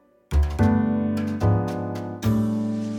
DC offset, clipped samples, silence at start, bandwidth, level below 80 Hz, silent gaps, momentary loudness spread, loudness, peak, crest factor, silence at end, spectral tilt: under 0.1%; under 0.1%; 0.3 s; 17.5 kHz; -30 dBFS; none; 7 LU; -24 LUFS; -6 dBFS; 16 dB; 0 s; -8.5 dB/octave